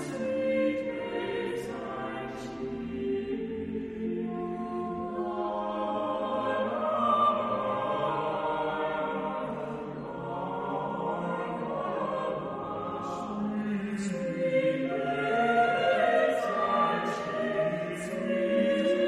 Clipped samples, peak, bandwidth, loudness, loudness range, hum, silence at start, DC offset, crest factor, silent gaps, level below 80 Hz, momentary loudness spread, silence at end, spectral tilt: under 0.1%; -14 dBFS; 12 kHz; -30 LUFS; 7 LU; none; 0 s; under 0.1%; 16 dB; none; -62 dBFS; 10 LU; 0 s; -6 dB/octave